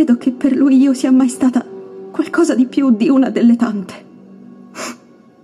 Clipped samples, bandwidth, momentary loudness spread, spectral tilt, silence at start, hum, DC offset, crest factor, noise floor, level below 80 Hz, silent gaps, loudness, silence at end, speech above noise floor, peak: under 0.1%; 12 kHz; 17 LU; -5.5 dB/octave; 0 s; none; under 0.1%; 12 dB; -44 dBFS; -62 dBFS; none; -14 LUFS; 0.5 s; 31 dB; -2 dBFS